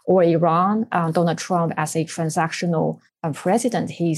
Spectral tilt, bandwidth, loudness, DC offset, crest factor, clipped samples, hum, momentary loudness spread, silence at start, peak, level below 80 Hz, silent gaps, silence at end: -6 dB/octave; 12.5 kHz; -21 LUFS; under 0.1%; 16 dB; under 0.1%; none; 8 LU; 0.05 s; -4 dBFS; -72 dBFS; none; 0 s